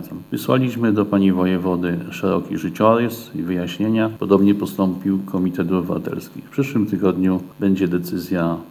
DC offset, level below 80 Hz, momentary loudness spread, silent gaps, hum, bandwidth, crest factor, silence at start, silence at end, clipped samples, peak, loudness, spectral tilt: under 0.1%; -56 dBFS; 8 LU; none; none; 19.5 kHz; 18 dB; 0 s; 0 s; under 0.1%; -2 dBFS; -20 LUFS; -7.5 dB/octave